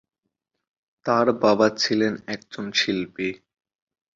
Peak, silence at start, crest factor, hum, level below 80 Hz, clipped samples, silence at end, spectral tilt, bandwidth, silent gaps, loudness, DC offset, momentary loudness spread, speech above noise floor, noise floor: -4 dBFS; 1.05 s; 20 dB; none; -64 dBFS; under 0.1%; 0.8 s; -4 dB/octave; 7.8 kHz; none; -22 LUFS; under 0.1%; 14 LU; 58 dB; -80 dBFS